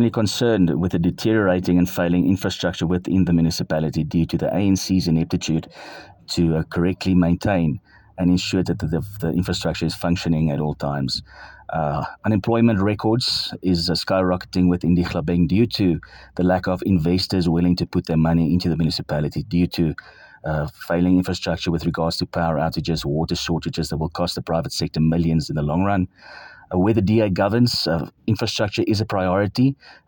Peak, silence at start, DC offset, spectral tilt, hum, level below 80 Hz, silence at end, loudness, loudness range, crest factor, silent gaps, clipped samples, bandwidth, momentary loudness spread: -4 dBFS; 0 s; under 0.1%; -6.5 dB/octave; none; -44 dBFS; 0.15 s; -21 LUFS; 3 LU; 16 dB; none; under 0.1%; 17.5 kHz; 7 LU